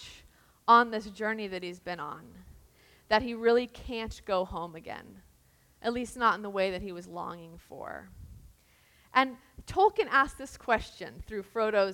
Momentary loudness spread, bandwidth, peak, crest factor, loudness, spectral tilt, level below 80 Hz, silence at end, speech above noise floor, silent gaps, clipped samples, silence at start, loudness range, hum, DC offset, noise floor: 19 LU; 17 kHz; -8 dBFS; 24 dB; -30 LUFS; -4.5 dB/octave; -54 dBFS; 0 s; 34 dB; none; under 0.1%; 0 s; 5 LU; none; under 0.1%; -64 dBFS